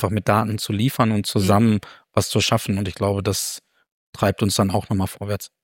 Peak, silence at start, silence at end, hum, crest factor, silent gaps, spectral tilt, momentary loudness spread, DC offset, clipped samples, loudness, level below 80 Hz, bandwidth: -2 dBFS; 0 s; 0.15 s; none; 18 dB; 3.92-4.13 s; -5 dB/octave; 8 LU; under 0.1%; under 0.1%; -21 LUFS; -52 dBFS; 17 kHz